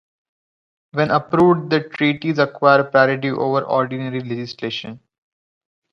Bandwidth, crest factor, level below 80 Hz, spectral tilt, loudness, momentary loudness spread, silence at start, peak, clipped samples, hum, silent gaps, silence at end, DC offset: 6.8 kHz; 18 dB; -60 dBFS; -7.5 dB/octave; -18 LUFS; 12 LU; 0.95 s; 0 dBFS; under 0.1%; none; none; 0.95 s; under 0.1%